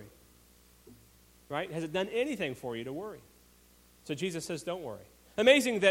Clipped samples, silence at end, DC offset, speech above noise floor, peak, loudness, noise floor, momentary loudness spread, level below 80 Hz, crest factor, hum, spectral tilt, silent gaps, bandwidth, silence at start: under 0.1%; 0 s; under 0.1%; 31 dB; -8 dBFS; -31 LUFS; -61 dBFS; 21 LU; -66 dBFS; 26 dB; 60 Hz at -65 dBFS; -4 dB/octave; none; 16.5 kHz; 0 s